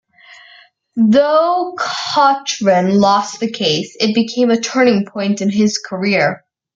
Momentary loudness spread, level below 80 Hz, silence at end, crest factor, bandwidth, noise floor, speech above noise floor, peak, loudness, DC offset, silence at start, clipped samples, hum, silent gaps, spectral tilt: 7 LU; -60 dBFS; 0.4 s; 14 dB; 7.8 kHz; -46 dBFS; 32 dB; -2 dBFS; -15 LUFS; under 0.1%; 0.95 s; under 0.1%; none; none; -4.5 dB/octave